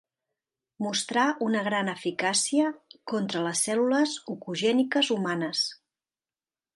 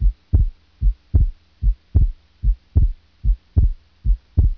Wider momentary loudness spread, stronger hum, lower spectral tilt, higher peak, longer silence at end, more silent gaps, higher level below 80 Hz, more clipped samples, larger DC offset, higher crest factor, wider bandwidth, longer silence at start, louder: about the same, 7 LU vs 5 LU; neither; second, -3 dB/octave vs -11.5 dB/octave; second, -10 dBFS vs -4 dBFS; first, 1 s vs 0.05 s; neither; second, -78 dBFS vs -20 dBFS; neither; neither; about the same, 18 dB vs 16 dB; first, 11.5 kHz vs 1.1 kHz; first, 0.8 s vs 0 s; second, -27 LUFS vs -23 LUFS